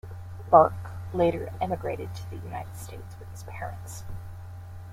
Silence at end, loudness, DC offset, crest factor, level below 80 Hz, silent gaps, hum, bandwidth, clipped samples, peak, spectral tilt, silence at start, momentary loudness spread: 0 s; -27 LUFS; under 0.1%; 26 dB; -50 dBFS; none; none; 16 kHz; under 0.1%; -2 dBFS; -7 dB/octave; 0.05 s; 23 LU